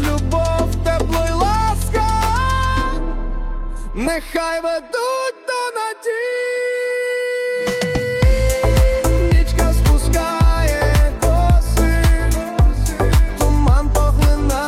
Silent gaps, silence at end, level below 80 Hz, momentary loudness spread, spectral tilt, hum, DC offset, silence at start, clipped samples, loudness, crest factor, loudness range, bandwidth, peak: none; 0 s; -18 dBFS; 7 LU; -5.5 dB/octave; none; under 0.1%; 0 s; under 0.1%; -18 LUFS; 12 dB; 5 LU; 16 kHz; -4 dBFS